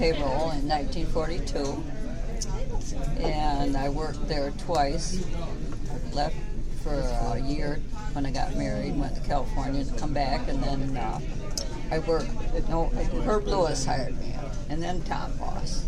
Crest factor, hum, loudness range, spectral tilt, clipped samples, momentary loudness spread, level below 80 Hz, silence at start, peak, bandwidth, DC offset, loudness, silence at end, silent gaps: 14 dB; none; 2 LU; -5.5 dB/octave; under 0.1%; 8 LU; -30 dBFS; 0 s; -10 dBFS; 10.5 kHz; under 0.1%; -30 LUFS; 0 s; none